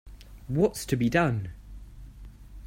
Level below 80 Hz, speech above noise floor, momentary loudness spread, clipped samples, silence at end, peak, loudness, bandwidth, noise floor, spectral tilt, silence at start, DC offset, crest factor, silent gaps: -46 dBFS; 20 dB; 24 LU; under 0.1%; 0 s; -10 dBFS; -27 LUFS; 16 kHz; -46 dBFS; -6.5 dB/octave; 0.05 s; under 0.1%; 20 dB; none